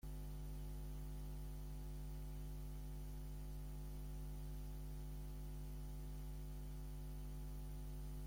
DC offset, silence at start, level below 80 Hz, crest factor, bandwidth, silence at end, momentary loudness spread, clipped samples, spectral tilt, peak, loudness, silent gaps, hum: under 0.1%; 0.05 s; -50 dBFS; 8 dB; 16.5 kHz; 0 s; 1 LU; under 0.1%; -6.5 dB/octave; -42 dBFS; -52 LUFS; none; 50 Hz at -50 dBFS